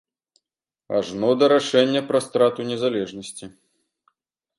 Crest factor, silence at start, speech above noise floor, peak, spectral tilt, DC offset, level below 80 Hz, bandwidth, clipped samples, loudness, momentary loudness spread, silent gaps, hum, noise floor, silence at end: 20 dB; 0.9 s; 68 dB; -4 dBFS; -4.5 dB/octave; under 0.1%; -66 dBFS; 11.5 kHz; under 0.1%; -21 LUFS; 15 LU; none; none; -89 dBFS; 1.1 s